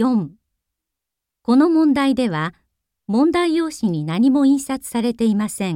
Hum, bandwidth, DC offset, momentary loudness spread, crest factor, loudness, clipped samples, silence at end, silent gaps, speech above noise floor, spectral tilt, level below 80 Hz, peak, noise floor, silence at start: none; 16 kHz; under 0.1%; 9 LU; 14 dB; -18 LUFS; under 0.1%; 0 s; none; 66 dB; -6 dB/octave; -54 dBFS; -4 dBFS; -83 dBFS; 0 s